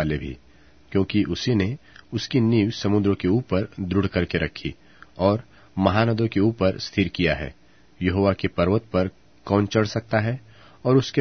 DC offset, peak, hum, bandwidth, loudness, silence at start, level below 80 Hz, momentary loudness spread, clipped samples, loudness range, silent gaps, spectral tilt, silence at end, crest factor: 0.2%; -2 dBFS; none; 6.6 kHz; -23 LUFS; 0 s; -46 dBFS; 10 LU; under 0.1%; 1 LU; none; -7 dB/octave; 0 s; 20 dB